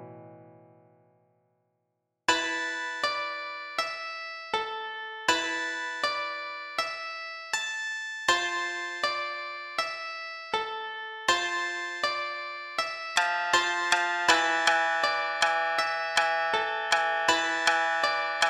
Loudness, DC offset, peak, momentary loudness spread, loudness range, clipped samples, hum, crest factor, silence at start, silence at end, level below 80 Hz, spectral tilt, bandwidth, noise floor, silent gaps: -28 LUFS; under 0.1%; -8 dBFS; 11 LU; 6 LU; under 0.1%; none; 22 dB; 0 s; 0 s; -70 dBFS; 0 dB/octave; 16 kHz; -80 dBFS; none